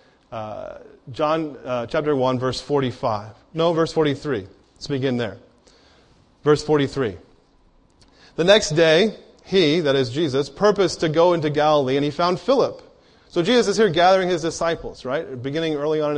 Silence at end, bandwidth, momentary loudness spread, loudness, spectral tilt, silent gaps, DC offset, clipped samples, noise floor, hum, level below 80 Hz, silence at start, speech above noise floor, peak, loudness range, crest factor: 0 s; 10.5 kHz; 13 LU; -20 LUFS; -5 dB/octave; none; under 0.1%; under 0.1%; -56 dBFS; none; -52 dBFS; 0.3 s; 36 dB; -2 dBFS; 6 LU; 18 dB